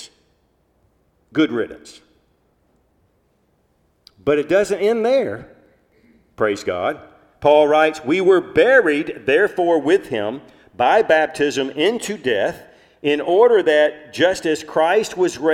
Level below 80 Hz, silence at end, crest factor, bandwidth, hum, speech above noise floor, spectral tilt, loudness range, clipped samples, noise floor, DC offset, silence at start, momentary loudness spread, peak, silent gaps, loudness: -58 dBFS; 0 s; 16 dB; 14.5 kHz; none; 46 dB; -4.5 dB/octave; 12 LU; under 0.1%; -63 dBFS; under 0.1%; 0 s; 12 LU; -2 dBFS; none; -17 LUFS